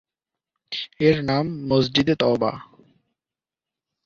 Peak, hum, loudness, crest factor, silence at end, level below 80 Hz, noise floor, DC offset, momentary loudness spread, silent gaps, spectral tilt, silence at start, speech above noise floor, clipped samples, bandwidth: -4 dBFS; none; -22 LUFS; 20 dB; 1.45 s; -54 dBFS; under -90 dBFS; under 0.1%; 12 LU; none; -6.5 dB/octave; 0.7 s; over 70 dB; under 0.1%; 7.4 kHz